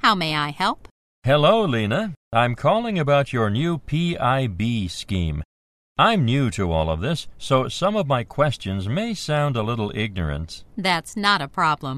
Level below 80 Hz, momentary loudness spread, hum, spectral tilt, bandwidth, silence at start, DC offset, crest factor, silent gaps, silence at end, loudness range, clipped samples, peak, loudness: -42 dBFS; 9 LU; none; -6 dB/octave; 13.5 kHz; 0.05 s; under 0.1%; 18 dB; 0.91-1.22 s, 2.17-2.31 s, 5.45-5.95 s; 0 s; 3 LU; under 0.1%; -2 dBFS; -22 LUFS